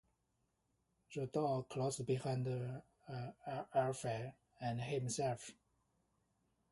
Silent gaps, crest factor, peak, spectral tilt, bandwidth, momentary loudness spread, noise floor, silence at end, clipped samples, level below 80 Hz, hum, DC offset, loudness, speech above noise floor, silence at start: none; 20 dB; -24 dBFS; -5.5 dB/octave; 11.5 kHz; 11 LU; -83 dBFS; 1.2 s; under 0.1%; -74 dBFS; none; under 0.1%; -42 LUFS; 43 dB; 1.1 s